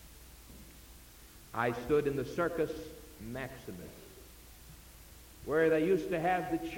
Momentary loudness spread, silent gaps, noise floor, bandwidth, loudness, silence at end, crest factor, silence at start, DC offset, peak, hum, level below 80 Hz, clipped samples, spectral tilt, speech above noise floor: 24 LU; none; -55 dBFS; 17 kHz; -33 LUFS; 0 s; 18 dB; 0 s; under 0.1%; -16 dBFS; none; -56 dBFS; under 0.1%; -6 dB/octave; 22 dB